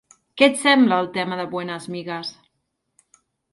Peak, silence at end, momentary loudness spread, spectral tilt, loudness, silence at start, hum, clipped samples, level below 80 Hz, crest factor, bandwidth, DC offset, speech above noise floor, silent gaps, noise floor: -2 dBFS; 1.2 s; 15 LU; -4 dB/octave; -20 LUFS; 0.35 s; none; under 0.1%; -70 dBFS; 20 dB; 11.5 kHz; under 0.1%; 55 dB; none; -75 dBFS